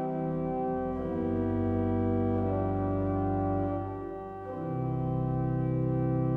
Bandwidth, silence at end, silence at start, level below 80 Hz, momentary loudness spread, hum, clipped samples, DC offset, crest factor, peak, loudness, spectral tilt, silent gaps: 3.7 kHz; 0 s; 0 s; -48 dBFS; 7 LU; none; under 0.1%; under 0.1%; 12 dB; -18 dBFS; -31 LUFS; -12 dB/octave; none